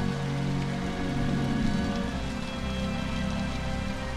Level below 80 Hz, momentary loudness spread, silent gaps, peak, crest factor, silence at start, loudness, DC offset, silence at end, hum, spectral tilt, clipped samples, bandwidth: -38 dBFS; 5 LU; none; -14 dBFS; 14 dB; 0 s; -30 LUFS; under 0.1%; 0 s; none; -6 dB/octave; under 0.1%; 13.5 kHz